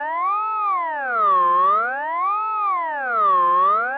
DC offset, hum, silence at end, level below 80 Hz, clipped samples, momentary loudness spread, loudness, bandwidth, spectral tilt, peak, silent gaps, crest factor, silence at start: under 0.1%; none; 0 s; -74 dBFS; under 0.1%; 6 LU; -19 LUFS; 4.5 kHz; -6 dB/octave; -10 dBFS; none; 8 dB; 0 s